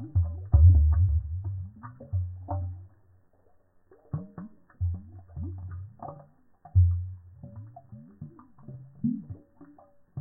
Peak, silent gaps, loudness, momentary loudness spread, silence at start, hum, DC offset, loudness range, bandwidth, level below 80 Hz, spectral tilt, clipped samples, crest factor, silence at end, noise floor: -8 dBFS; none; -27 LUFS; 25 LU; 0 s; none; under 0.1%; 13 LU; 1.7 kHz; -34 dBFS; -15 dB/octave; under 0.1%; 20 dB; 0 s; -62 dBFS